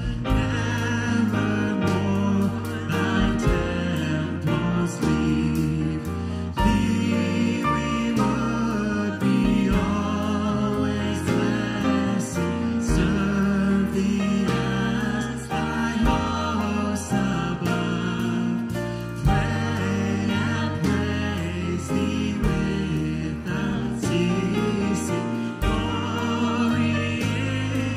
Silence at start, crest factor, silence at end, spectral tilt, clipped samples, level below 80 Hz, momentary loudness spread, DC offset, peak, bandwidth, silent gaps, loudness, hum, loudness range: 0 s; 16 dB; 0 s; -6 dB/octave; under 0.1%; -36 dBFS; 4 LU; under 0.1%; -6 dBFS; 15.5 kHz; none; -24 LUFS; none; 2 LU